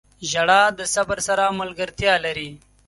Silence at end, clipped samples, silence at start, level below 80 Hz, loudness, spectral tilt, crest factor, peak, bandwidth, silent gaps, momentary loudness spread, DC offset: 0.3 s; under 0.1%; 0.2 s; -50 dBFS; -20 LUFS; -2 dB/octave; 18 dB; -2 dBFS; 11.5 kHz; none; 12 LU; under 0.1%